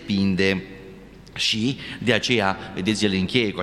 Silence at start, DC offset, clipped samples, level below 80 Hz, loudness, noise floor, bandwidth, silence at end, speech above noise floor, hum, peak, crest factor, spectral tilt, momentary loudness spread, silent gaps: 0 s; under 0.1%; under 0.1%; -52 dBFS; -22 LUFS; -43 dBFS; 12.5 kHz; 0 s; 21 dB; none; -2 dBFS; 22 dB; -4.5 dB/octave; 9 LU; none